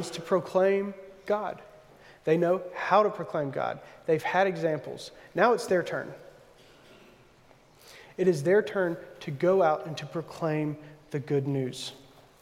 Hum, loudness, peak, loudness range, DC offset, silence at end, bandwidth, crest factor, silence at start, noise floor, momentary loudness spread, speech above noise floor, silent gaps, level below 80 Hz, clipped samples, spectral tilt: none; -28 LUFS; -8 dBFS; 3 LU; under 0.1%; 0.45 s; 15.5 kHz; 20 dB; 0 s; -58 dBFS; 15 LU; 30 dB; none; -70 dBFS; under 0.1%; -6 dB/octave